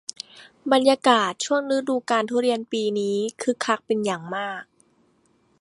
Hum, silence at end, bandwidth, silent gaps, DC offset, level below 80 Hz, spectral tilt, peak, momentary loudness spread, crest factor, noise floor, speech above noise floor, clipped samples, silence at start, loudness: none; 1 s; 11.5 kHz; none; under 0.1%; -74 dBFS; -3.5 dB/octave; -2 dBFS; 15 LU; 22 dB; -63 dBFS; 41 dB; under 0.1%; 0.35 s; -23 LUFS